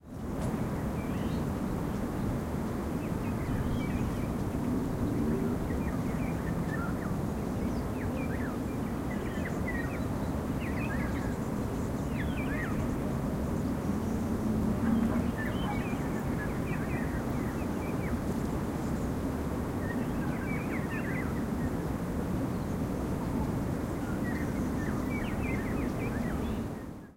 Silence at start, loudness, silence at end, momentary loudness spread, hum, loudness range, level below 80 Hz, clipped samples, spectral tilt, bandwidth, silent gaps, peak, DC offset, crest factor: 0.05 s; -33 LUFS; 0 s; 3 LU; none; 2 LU; -42 dBFS; under 0.1%; -7.5 dB/octave; 16 kHz; none; -18 dBFS; under 0.1%; 14 dB